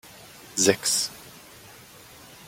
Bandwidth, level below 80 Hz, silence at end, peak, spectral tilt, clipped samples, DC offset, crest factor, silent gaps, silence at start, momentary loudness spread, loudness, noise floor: 16.5 kHz; -64 dBFS; 0.15 s; -4 dBFS; -2 dB/octave; under 0.1%; under 0.1%; 24 dB; none; 0.05 s; 25 LU; -23 LUFS; -48 dBFS